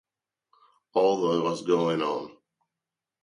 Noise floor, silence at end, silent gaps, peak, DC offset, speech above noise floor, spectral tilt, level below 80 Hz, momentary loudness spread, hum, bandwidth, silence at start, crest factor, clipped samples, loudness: -89 dBFS; 0.9 s; none; -10 dBFS; under 0.1%; 64 dB; -6 dB/octave; -74 dBFS; 9 LU; none; 11 kHz; 0.95 s; 18 dB; under 0.1%; -26 LUFS